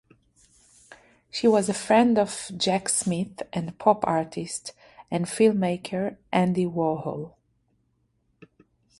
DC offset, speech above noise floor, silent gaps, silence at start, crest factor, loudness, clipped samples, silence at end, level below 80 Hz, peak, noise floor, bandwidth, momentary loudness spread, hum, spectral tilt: under 0.1%; 46 dB; none; 0.9 s; 22 dB; -25 LUFS; under 0.1%; 1.7 s; -64 dBFS; -4 dBFS; -70 dBFS; 11.5 kHz; 12 LU; none; -5 dB/octave